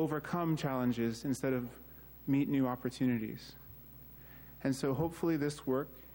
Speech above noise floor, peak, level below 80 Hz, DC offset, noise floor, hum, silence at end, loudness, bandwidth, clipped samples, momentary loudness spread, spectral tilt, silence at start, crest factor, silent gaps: 19 dB; -20 dBFS; -62 dBFS; under 0.1%; -53 dBFS; none; 0 s; -35 LUFS; 16.5 kHz; under 0.1%; 18 LU; -7 dB/octave; 0 s; 14 dB; none